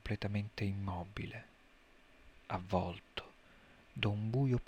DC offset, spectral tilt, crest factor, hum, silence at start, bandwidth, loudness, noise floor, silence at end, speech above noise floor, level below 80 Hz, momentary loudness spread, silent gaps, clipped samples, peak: under 0.1%; -7.5 dB/octave; 22 dB; none; 0.05 s; 9.8 kHz; -39 LUFS; -64 dBFS; 0.05 s; 26 dB; -58 dBFS; 16 LU; none; under 0.1%; -18 dBFS